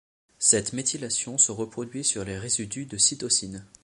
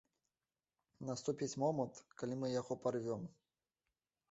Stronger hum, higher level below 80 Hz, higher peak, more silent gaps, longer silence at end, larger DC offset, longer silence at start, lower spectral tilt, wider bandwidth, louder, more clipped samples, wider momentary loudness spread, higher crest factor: neither; first, -58 dBFS vs -80 dBFS; first, -4 dBFS vs -24 dBFS; neither; second, 0.2 s vs 1 s; neither; second, 0.4 s vs 1 s; second, -2 dB/octave vs -6.5 dB/octave; first, 11.5 kHz vs 8 kHz; first, -24 LUFS vs -42 LUFS; neither; first, 12 LU vs 9 LU; about the same, 22 dB vs 20 dB